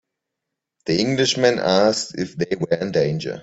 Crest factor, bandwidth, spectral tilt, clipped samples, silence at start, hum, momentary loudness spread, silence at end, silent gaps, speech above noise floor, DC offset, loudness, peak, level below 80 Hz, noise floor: 18 dB; 8.2 kHz; -4.5 dB/octave; under 0.1%; 0.85 s; none; 8 LU; 0 s; none; 62 dB; under 0.1%; -20 LUFS; -2 dBFS; -58 dBFS; -82 dBFS